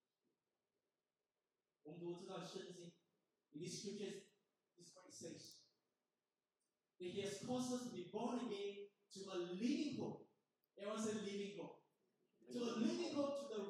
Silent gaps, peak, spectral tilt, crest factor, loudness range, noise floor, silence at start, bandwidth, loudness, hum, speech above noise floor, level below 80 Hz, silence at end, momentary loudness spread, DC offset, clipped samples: none; -30 dBFS; -4.5 dB/octave; 20 dB; 10 LU; under -90 dBFS; 1.85 s; 13.5 kHz; -48 LUFS; none; over 43 dB; under -90 dBFS; 0 s; 17 LU; under 0.1%; under 0.1%